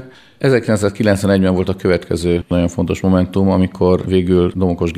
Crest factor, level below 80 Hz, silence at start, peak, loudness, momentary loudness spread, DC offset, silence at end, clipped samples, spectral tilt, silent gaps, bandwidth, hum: 14 dB; -38 dBFS; 0 s; 0 dBFS; -15 LUFS; 4 LU; under 0.1%; 0 s; under 0.1%; -7 dB/octave; none; 13.5 kHz; none